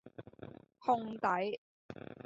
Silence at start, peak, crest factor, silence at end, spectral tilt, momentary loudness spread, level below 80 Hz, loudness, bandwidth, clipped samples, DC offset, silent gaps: 0.05 s; -18 dBFS; 20 dB; 0.05 s; -4 dB/octave; 19 LU; -74 dBFS; -36 LUFS; 7.6 kHz; under 0.1%; under 0.1%; 1.58-1.89 s